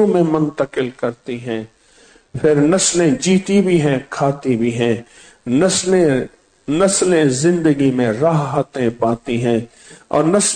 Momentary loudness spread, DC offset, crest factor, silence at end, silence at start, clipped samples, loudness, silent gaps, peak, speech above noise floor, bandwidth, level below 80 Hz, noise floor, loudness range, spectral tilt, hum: 11 LU; under 0.1%; 12 dB; 0 s; 0 s; under 0.1%; -16 LUFS; none; -4 dBFS; 34 dB; 9.4 kHz; -48 dBFS; -49 dBFS; 2 LU; -5 dB/octave; none